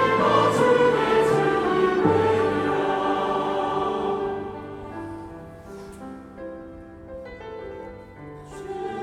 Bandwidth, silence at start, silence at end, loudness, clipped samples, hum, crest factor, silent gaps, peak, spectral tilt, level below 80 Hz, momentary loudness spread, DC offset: 13.5 kHz; 0 s; 0 s; -22 LUFS; under 0.1%; none; 18 dB; none; -6 dBFS; -6 dB/octave; -52 dBFS; 22 LU; under 0.1%